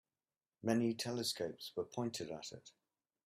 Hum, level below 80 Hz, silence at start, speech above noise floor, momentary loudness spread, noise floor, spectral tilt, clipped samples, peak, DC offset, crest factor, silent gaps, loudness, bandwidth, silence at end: none; -80 dBFS; 0.65 s; over 50 dB; 12 LU; under -90 dBFS; -4.5 dB/octave; under 0.1%; -22 dBFS; under 0.1%; 20 dB; none; -40 LUFS; 15.5 kHz; 0.55 s